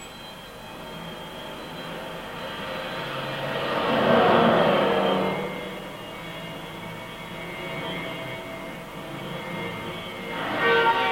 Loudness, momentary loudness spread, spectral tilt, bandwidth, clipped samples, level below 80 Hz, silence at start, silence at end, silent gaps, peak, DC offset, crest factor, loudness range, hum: -26 LUFS; 17 LU; -5.5 dB/octave; 17 kHz; under 0.1%; -54 dBFS; 0 s; 0 s; none; -6 dBFS; under 0.1%; 20 dB; 11 LU; none